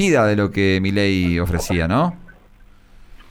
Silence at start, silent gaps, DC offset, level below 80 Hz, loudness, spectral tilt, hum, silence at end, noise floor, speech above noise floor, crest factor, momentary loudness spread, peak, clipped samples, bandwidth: 0 s; none; under 0.1%; -36 dBFS; -18 LUFS; -6 dB/octave; none; 0.1 s; -47 dBFS; 29 dB; 14 dB; 5 LU; -4 dBFS; under 0.1%; 18 kHz